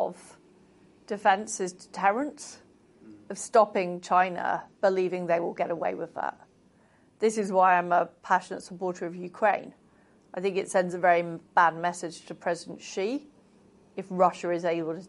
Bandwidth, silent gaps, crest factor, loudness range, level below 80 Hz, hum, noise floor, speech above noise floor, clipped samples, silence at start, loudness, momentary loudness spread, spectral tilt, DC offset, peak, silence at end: 11.5 kHz; none; 20 dB; 3 LU; -76 dBFS; none; -61 dBFS; 34 dB; under 0.1%; 0 s; -27 LUFS; 14 LU; -4.5 dB/octave; under 0.1%; -8 dBFS; 0 s